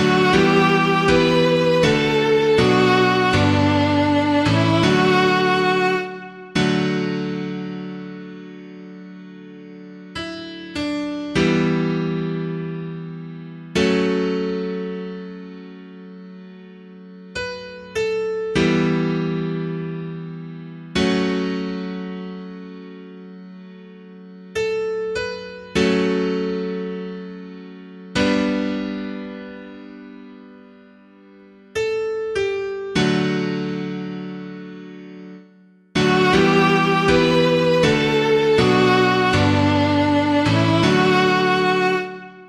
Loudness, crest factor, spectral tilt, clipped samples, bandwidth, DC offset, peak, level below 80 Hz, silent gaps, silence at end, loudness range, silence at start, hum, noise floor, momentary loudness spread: -19 LUFS; 18 dB; -6 dB/octave; under 0.1%; 12 kHz; under 0.1%; -2 dBFS; -46 dBFS; none; 0 s; 14 LU; 0 s; none; -51 dBFS; 22 LU